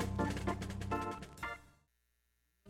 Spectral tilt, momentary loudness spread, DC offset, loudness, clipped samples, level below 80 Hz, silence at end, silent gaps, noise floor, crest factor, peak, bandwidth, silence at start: -6 dB/octave; 8 LU; under 0.1%; -40 LUFS; under 0.1%; -52 dBFS; 0 s; none; -80 dBFS; 18 dB; -24 dBFS; 16 kHz; 0 s